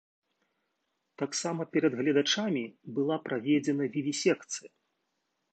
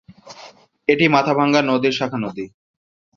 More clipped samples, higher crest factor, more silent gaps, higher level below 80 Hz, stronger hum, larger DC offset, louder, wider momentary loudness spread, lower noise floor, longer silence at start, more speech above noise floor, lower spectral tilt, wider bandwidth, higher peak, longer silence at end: neither; about the same, 18 dB vs 20 dB; neither; second, -82 dBFS vs -60 dBFS; neither; neither; second, -30 LUFS vs -18 LUFS; second, 9 LU vs 14 LU; first, -80 dBFS vs -45 dBFS; first, 1.2 s vs 0.25 s; first, 51 dB vs 27 dB; second, -4 dB/octave vs -5.5 dB/octave; first, 9 kHz vs 7.4 kHz; second, -12 dBFS vs -2 dBFS; first, 0.85 s vs 0.7 s